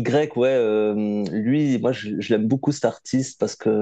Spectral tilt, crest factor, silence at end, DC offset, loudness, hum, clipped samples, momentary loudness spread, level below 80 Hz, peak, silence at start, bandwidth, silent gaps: -6.5 dB/octave; 16 dB; 0 s; under 0.1%; -22 LUFS; none; under 0.1%; 5 LU; -66 dBFS; -6 dBFS; 0 s; 9 kHz; none